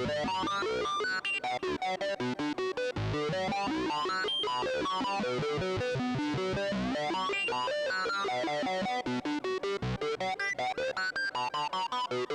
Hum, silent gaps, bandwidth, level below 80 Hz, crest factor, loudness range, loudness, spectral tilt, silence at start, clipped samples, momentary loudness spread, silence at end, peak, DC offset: none; none; 12 kHz; -56 dBFS; 8 dB; 1 LU; -32 LUFS; -4.5 dB/octave; 0 s; under 0.1%; 3 LU; 0 s; -26 dBFS; under 0.1%